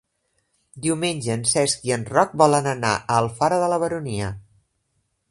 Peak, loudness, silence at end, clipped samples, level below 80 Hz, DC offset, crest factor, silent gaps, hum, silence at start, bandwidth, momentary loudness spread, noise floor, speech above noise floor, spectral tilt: -2 dBFS; -21 LUFS; 0.9 s; under 0.1%; -52 dBFS; under 0.1%; 22 dB; none; none; 0.75 s; 11.5 kHz; 10 LU; -72 dBFS; 50 dB; -4 dB/octave